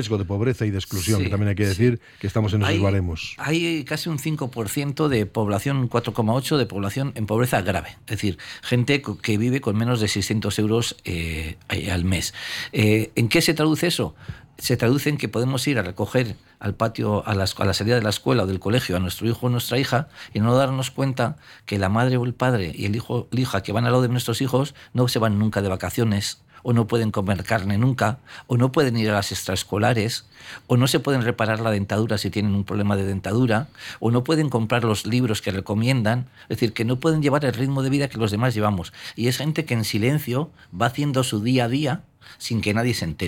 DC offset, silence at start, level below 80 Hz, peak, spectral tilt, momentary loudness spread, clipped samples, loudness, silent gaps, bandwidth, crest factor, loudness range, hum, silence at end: under 0.1%; 0 s; -52 dBFS; -6 dBFS; -5.5 dB/octave; 7 LU; under 0.1%; -23 LUFS; none; 17 kHz; 16 dB; 2 LU; none; 0 s